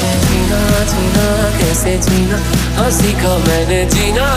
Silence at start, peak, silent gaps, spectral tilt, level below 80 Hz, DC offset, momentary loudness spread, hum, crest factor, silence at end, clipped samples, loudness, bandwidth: 0 s; 0 dBFS; none; -4.5 dB/octave; -20 dBFS; under 0.1%; 1 LU; none; 12 dB; 0 s; under 0.1%; -13 LUFS; 15.5 kHz